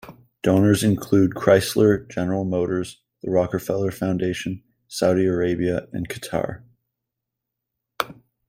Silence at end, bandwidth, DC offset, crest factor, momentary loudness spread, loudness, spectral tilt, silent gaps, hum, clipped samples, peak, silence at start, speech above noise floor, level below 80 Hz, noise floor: 0.35 s; 16.5 kHz; under 0.1%; 22 dB; 13 LU; -22 LUFS; -6 dB/octave; none; none; under 0.1%; -2 dBFS; 0.05 s; 63 dB; -54 dBFS; -83 dBFS